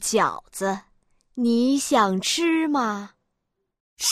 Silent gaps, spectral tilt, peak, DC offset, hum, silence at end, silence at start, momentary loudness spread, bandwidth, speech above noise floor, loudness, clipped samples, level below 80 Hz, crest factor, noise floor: 3.80-3.97 s; -3 dB/octave; -8 dBFS; under 0.1%; none; 0 s; 0 s; 14 LU; 15.5 kHz; 56 dB; -22 LUFS; under 0.1%; -62 dBFS; 16 dB; -78 dBFS